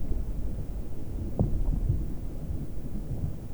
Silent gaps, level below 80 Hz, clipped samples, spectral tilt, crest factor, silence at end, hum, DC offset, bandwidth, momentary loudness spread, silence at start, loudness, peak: none; -32 dBFS; under 0.1%; -9 dB/octave; 16 dB; 0 s; none; under 0.1%; over 20 kHz; 9 LU; 0 s; -34 LUFS; -12 dBFS